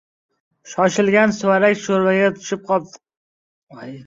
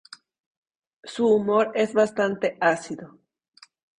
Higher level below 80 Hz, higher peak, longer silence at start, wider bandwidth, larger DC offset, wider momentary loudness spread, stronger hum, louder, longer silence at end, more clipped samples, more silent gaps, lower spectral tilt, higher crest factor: about the same, -64 dBFS vs -68 dBFS; first, -2 dBFS vs -6 dBFS; second, 0.65 s vs 1.05 s; second, 7.8 kHz vs 10.5 kHz; neither; about the same, 14 LU vs 16 LU; neither; first, -17 LUFS vs -23 LUFS; second, 0 s vs 0.95 s; neither; first, 3.17-3.67 s vs none; about the same, -5 dB/octave vs -5 dB/octave; about the same, 18 dB vs 18 dB